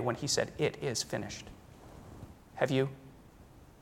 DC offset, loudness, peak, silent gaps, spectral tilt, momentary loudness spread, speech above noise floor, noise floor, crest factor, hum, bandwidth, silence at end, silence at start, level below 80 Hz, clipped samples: under 0.1%; -34 LUFS; -14 dBFS; none; -4 dB/octave; 22 LU; 23 dB; -56 dBFS; 22 dB; none; 17 kHz; 0.1 s; 0 s; -60 dBFS; under 0.1%